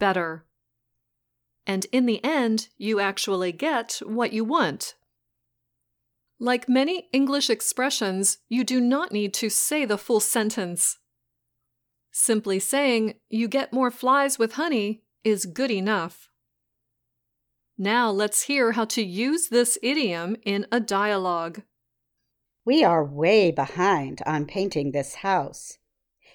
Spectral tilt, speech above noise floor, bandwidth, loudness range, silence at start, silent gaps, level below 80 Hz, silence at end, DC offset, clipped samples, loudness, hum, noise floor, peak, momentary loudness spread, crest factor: -3 dB/octave; 55 dB; over 20 kHz; 4 LU; 0 s; none; -70 dBFS; 0.6 s; under 0.1%; under 0.1%; -24 LUFS; none; -79 dBFS; -8 dBFS; 8 LU; 18 dB